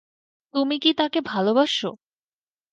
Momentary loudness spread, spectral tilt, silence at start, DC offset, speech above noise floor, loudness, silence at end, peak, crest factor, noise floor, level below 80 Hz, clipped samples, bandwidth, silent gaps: 7 LU; -4.5 dB/octave; 0.55 s; under 0.1%; over 68 dB; -22 LUFS; 0.8 s; -6 dBFS; 18 dB; under -90 dBFS; -72 dBFS; under 0.1%; 9.2 kHz; none